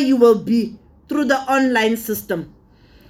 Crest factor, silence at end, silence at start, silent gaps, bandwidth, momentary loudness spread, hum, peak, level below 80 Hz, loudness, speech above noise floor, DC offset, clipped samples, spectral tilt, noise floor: 16 dB; 0.6 s; 0 s; none; 18 kHz; 13 LU; none; -2 dBFS; -54 dBFS; -18 LUFS; 32 dB; under 0.1%; under 0.1%; -5 dB/octave; -49 dBFS